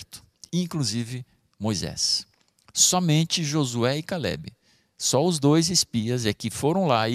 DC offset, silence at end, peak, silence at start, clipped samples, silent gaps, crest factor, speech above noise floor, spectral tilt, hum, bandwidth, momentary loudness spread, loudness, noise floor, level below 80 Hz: under 0.1%; 0 s; -6 dBFS; 0 s; under 0.1%; none; 18 dB; 24 dB; -4 dB/octave; none; 15.5 kHz; 13 LU; -23 LUFS; -47 dBFS; -56 dBFS